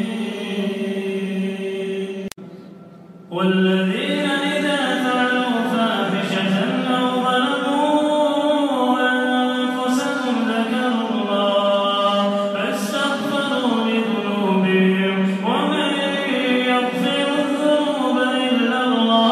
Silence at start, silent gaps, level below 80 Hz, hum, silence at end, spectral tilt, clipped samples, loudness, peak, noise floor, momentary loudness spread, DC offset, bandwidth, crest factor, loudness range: 0 s; none; -72 dBFS; none; 0 s; -5.5 dB/octave; under 0.1%; -19 LUFS; -4 dBFS; -41 dBFS; 7 LU; under 0.1%; 14 kHz; 14 dB; 4 LU